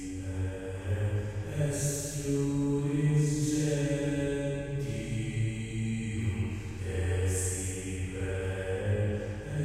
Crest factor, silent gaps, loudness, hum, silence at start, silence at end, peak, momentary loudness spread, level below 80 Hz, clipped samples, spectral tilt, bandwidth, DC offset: 14 dB; none; -32 LUFS; none; 0 s; 0 s; -16 dBFS; 7 LU; -46 dBFS; under 0.1%; -6 dB/octave; 15.5 kHz; under 0.1%